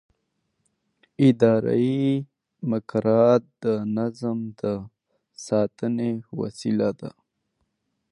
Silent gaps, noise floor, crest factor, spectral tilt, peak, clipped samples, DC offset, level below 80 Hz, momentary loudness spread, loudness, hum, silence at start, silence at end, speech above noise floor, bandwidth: none; -75 dBFS; 20 dB; -8 dB/octave; -6 dBFS; under 0.1%; under 0.1%; -64 dBFS; 14 LU; -24 LUFS; none; 1.2 s; 1.05 s; 53 dB; 11 kHz